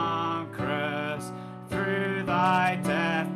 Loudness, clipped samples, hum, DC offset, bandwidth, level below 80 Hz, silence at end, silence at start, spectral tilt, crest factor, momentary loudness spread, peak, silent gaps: -27 LUFS; under 0.1%; none; under 0.1%; 13.5 kHz; -58 dBFS; 0 s; 0 s; -6 dB/octave; 16 dB; 11 LU; -12 dBFS; none